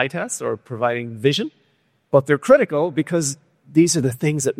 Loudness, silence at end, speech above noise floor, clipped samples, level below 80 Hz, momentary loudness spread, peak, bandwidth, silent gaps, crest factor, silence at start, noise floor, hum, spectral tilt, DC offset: -19 LUFS; 0.05 s; 45 dB; under 0.1%; -60 dBFS; 10 LU; -2 dBFS; 15.5 kHz; none; 18 dB; 0 s; -64 dBFS; none; -5 dB/octave; under 0.1%